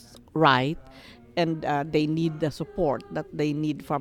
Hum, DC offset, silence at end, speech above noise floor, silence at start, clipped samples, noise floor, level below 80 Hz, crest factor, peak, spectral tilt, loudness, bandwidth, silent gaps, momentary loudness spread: none; under 0.1%; 0 s; 23 dB; 0.1 s; under 0.1%; -48 dBFS; -52 dBFS; 20 dB; -6 dBFS; -6.5 dB/octave; -26 LUFS; 15 kHz; none; 12 LU